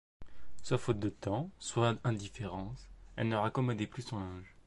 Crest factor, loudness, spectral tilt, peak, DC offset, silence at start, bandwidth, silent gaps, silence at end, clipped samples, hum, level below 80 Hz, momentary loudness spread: 18 dB; -36 LUFS; -6 dB/octave; -18 dBFS; under 0.1%; 0.2 s; 11.5 kHz; none; 0 s; under 0.1%; none; -56 dBFS; 13 LU